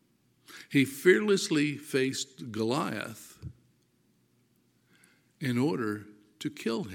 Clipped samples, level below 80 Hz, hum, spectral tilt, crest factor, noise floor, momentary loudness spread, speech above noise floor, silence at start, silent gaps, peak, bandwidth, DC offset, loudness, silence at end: under 0.1%; -70 dBFS; none; -5 dB/octave; 24 dB; -69 dBFS; 22 LU; 41 dB; 0.5 s; none; -8 dBFS; 17 kHz; under 0.1%; -29 LUFS; 0 s